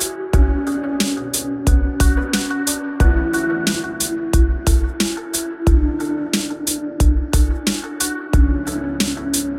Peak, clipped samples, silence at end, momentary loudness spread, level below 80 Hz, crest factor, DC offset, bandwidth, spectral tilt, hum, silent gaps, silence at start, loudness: -2 dBFS; under 0.1%; 0 s; 5 LU; -20 dBFS; 16 dB; under 0.1%; 16.5 kHz; -4.5 dB/octave; none; none; 0 s; -19 LUFS